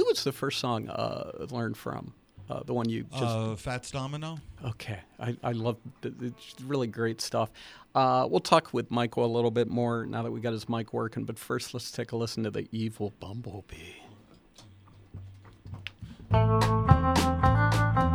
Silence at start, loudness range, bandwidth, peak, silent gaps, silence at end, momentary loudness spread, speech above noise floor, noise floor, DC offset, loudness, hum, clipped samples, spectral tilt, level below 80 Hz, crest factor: 0 s; 9 LU; 15 kHz; -4 dBFS; none; 0 s; 18 LU; 25 dB; -55 dBFS; under 0.1%; -30 LUFS; none; under 0.1%; -6 dB/octave; -44 dBFS; 26 dB